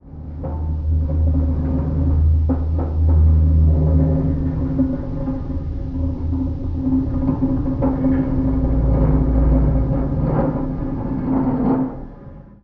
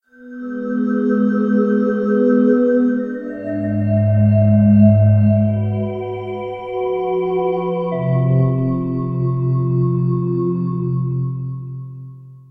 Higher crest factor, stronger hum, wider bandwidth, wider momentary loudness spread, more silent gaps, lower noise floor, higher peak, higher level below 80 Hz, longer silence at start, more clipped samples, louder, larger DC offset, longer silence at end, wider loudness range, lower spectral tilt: about the same, 14 dB vs 16 dB; neither; second, 2.5 kHz vs 3.3 kHz; second, 9 LU vs 13 LU; neither; about the same, -38 dBFS vs -36 dBFS; second, -4 dBFS vs 0 dBFS; first, -22 dBFS vs -48 dBFS; second, 0.05 s vs 0.2 s; neither; about the same, -19 LUFS vs -17 LUFS; neither; about the same, 0.2 s vs 0.15 s; about the same, 4 LU vs 5 LU; about the same, -12 dB/octave vs -12 dB/octave